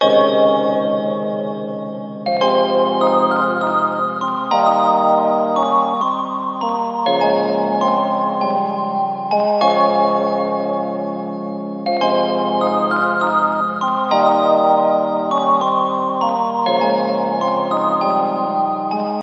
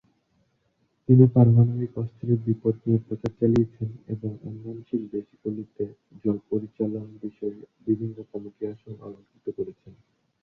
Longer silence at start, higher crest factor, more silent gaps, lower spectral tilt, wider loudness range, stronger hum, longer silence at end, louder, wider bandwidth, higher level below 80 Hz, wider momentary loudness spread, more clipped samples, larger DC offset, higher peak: second, 0 s vs 1.1 s; second, 14 dB vs 22 dB; neither; second, -6.5 dB/octave vs -12 dB/octave; second, 2 LU vs 11 LU; neither; second, 0 s vs 0.5 s; first, -17 LUFS vs -25 LUFS; first, 7.8 kHz vs 3.9 kHz; second, -78 dBFS vs -58 dBFS; second, 8 LU vs 20 LU; neither; neither; about the same, -2 dBFS vs -4 dBFS